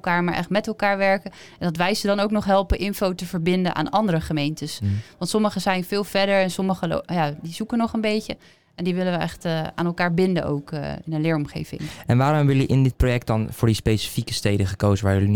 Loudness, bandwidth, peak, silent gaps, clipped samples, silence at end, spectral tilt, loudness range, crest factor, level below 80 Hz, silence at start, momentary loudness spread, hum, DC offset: -23 LUFS; 19.5 kHz; -8 dBFS; none; under 0.1%; 0 s; -6 dB/octave; 3 LU; 14 dB; -40 dBFS; 0.05 s; 8 LU; none; 0.4%